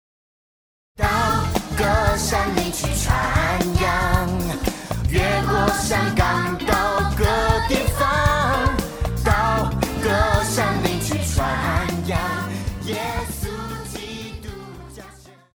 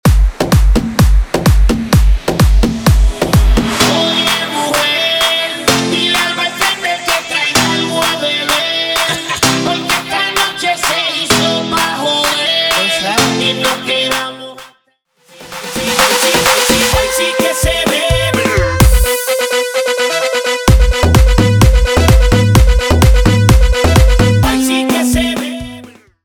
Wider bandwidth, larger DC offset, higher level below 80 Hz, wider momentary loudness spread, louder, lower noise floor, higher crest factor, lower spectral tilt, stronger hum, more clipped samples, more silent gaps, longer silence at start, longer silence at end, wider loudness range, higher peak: about the same, over 20 kHz vs over 20 kHz; neither; second, -28 dBFS vs -16 dBFS; first, 11 LU vs 5 LU; second, -21 LUFS vs -12 LUFS; second, -45 dBFS vs -57 dBFS; first, 18 dB vs 12 dB; about the same, -4.5 dB/octave vs -4 dB/octave; neither; neither; neither; first, 0.95 s vs 0.05 s; about the same, 0.35 s vs 0.35 s; about the same, 5 LU vs 3 LU; about the same, -2 dBFS vs 0 dBFS